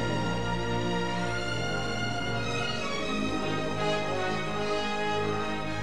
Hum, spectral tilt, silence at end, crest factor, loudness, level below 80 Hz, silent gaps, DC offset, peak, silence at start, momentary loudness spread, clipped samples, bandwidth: none; -5 dB/octave; 0 s; 12 dB; -30 LUFS; -48 dBFS; none; 1%; -16 dBFS; 0 s; 2 LU; under 0.1%; 12.5 kHz